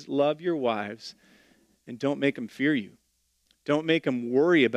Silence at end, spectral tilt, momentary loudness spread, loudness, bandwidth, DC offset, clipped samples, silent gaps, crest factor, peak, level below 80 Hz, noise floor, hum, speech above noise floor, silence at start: 0 s; -6.5 dB/octave; 17 LU; -27 LUFS; 10 kHz; under 0.1%; under 0.1%; none; 18 dB; -8 dBFS; -74 dBFS; -70 dBFS; none; 44 dB; 0 s